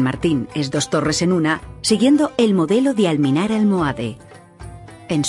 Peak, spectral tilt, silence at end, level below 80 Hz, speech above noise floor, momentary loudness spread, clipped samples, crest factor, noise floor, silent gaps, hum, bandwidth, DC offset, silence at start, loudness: -2 dBFS; -5.5 dB/octave; 0 s; -46 dBFS; 20 dB; 13 LU; under 0.1%; 16 dB; -38 dBFS; none; none; 14 kHz; under 0.1%; 0 s; -18 LUFS